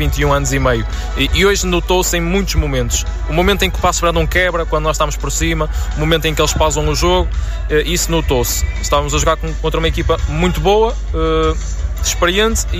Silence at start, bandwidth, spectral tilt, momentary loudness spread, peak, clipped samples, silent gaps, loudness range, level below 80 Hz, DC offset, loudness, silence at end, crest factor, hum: 0 s; 16 kHz; -4 dB/octave; 6 LU; -2 dBFS; under 0.1%; none; 1 LU; -20 dBFS; under 0.1%; -15 LUFS; 0 s; 12 dB; none